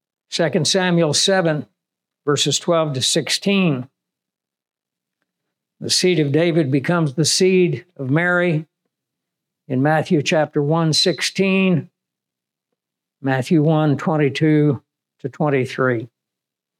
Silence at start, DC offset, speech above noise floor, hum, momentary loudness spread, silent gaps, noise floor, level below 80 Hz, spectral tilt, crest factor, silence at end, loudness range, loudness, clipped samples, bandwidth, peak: 0.3 s; under 0.1%; 68 dB; none; 10 LU; none; -86 dBFS; -76 dBFS; -4.5 dB/octave; 14 dB; 0.75 s; 3 LU; -18 LUFS; under 0.1%; 15.5 kHz; -6 dBFS